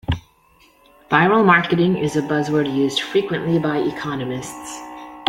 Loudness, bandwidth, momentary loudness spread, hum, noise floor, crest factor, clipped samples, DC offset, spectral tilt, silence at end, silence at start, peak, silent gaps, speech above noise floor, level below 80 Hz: -19 LUFS; 16 kHz; 17 LU; none; -54 dBFS; 18 dB; under 0.1%; under 0.1%; -5.5 dB/octave; 0 s; 0.1 s; -2 dBFS; none; 36 dB; -46 dBFS